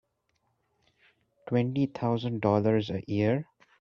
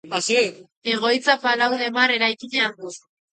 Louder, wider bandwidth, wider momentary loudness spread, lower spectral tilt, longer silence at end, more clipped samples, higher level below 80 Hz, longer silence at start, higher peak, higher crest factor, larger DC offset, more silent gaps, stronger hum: second, -28 LUFS vs -20 LUFS; second, 6.8 kHz vs 9.4 kHz; about the same, 6 LU vs 8 LU; first, -9 dB/octave vs -2 dB/octave; about the same, 0.4 s vs 0.35 s; neither; first, -66 dBFS vs -76 dBFS; first, 1.45 s vs 0.05 s; second, -12 dBFS vs -2 dBFS; about the same, 18 dB vs 20 dB; neither; second, none vs 0.77-0.81 s; neither